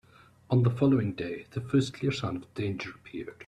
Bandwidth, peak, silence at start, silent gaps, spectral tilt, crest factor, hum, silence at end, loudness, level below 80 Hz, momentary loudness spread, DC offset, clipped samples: 10.5 kHz; -12 dBFS; 0.5 s; none; -7.5 dB/octave; 16 dB; none; 0.05 s; -29 LUFS; -60 dBFS; 13 LU; under 0.1%; under 0.1%